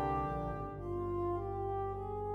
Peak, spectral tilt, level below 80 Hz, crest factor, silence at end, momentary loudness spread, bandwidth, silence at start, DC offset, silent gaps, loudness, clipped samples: -24 dBFS; -10 dB/octave; -50 dBFS; 14 dB; 0 s; 4 LU; 6.2 kHz; 0 s; under 0.1%; none; -38 LUFS; under 0.1%